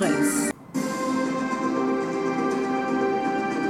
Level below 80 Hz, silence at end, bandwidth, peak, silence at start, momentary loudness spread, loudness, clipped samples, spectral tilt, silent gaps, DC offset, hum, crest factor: -62 dBFS; 0 s; 16 kHz; -12 dBFS; 0 s; 4 LU; -25 LUFS; under 0.1%; -4.5 dB/octave; none; under 0.1%; none; 14 dB